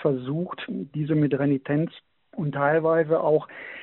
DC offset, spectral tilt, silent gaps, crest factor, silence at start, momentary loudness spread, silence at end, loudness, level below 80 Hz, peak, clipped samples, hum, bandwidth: under 0.1%; -7 dB/octave; none; 16 dB; 0 s; 10 LU; 0 s; -25 LUFS; -64 dBFS; -8 dBFS; under 0.1%; none; 4.2 kHz